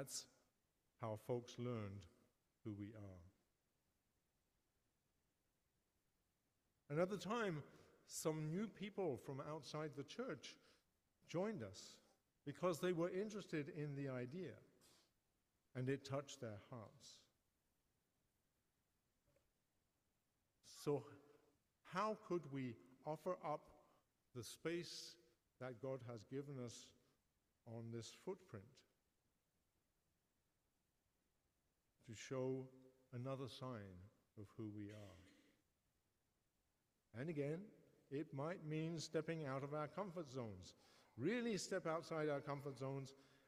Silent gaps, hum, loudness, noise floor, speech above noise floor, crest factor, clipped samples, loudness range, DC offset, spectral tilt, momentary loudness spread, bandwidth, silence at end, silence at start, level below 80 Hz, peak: none; none; -49 LUFS; -88 dBFS; 40 dB; 22 dB; under 0.1%; 11 LU; under 0.1%; -5.5 dB/octave; 17 LU; 15.5 kHz; 0.2 s; 0 s; -86 dBFS; -28 dBFS